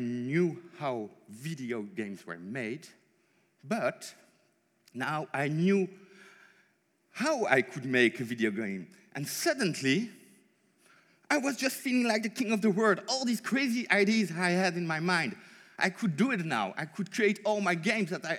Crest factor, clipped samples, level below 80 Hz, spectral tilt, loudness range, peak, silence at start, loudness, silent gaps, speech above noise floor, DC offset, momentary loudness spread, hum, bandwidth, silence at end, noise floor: 24 dB; under 0.1%; under -90 dBFS; -5 dB/octave; 10 LU; -8 dBFS; 0 s; -30 LUFS; none; 41 dB; under 0.1%; 13 LU; none; 17.5 kHz; 0 s; -71 dBFS